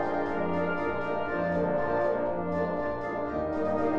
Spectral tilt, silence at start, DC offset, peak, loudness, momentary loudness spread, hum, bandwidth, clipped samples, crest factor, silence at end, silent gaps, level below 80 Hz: -8.5 dB/octave; 0 s; 0.8%; -16 dBFS; -30 LUFS; 4 LU; none; 7.2 kHz; under 0.1%; 12 dB; 0 s; none; -52 dBFS